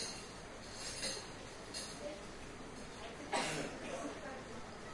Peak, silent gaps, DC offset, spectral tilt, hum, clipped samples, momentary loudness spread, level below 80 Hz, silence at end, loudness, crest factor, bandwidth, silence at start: -24 dBFS; none; under 0.1%; -2.5 dB/octave; none; under 0.1%; 11 LU; -60 dBFS; 0 s; -44 LUFS; 22 dB; 11.5 kHz; 0 s